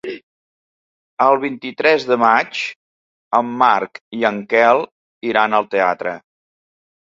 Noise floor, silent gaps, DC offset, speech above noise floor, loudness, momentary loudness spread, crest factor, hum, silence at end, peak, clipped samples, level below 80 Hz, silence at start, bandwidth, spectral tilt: under -90 dBFS; 0.23-1.17 s, 2.76-3.31 s, 4.01-4.11 s, 4.92-5.21 s; under 0.1%; over 74 dB; -17 LUFS; 14 LU; 18 dB; none; 0.85 s; 0 dBFS; under 0.1%; -66 dBFS; 0.05 s; 7.8 kHz; -5 dB/octave